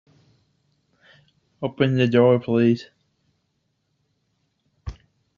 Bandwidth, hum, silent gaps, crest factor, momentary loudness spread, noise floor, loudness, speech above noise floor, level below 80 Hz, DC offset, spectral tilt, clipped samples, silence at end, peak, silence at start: 7 kHz; none; none; 20 dB; 23 LU; -72 dBFS; -20 LUFS; 54 dB; -52 dBFS; under 0.1%; -6.5 dB/octave; under 0.1%; 0.45 s; -4 dBFS; 1.6 s